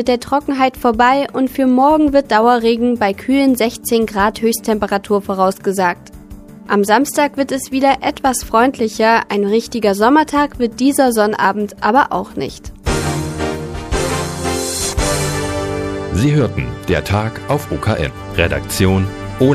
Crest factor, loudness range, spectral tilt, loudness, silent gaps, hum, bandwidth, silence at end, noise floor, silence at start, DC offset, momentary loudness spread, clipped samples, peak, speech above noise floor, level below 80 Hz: 16 dB; 5 LU; -5 dB/octave; -15 LUFS; none; none; 15.5 kHz; 0 s; -35 dBFS; 0 s; under 0.1%; 8 LU; under 0.1%; 0 dBFS; 21 dB; -34 dBFS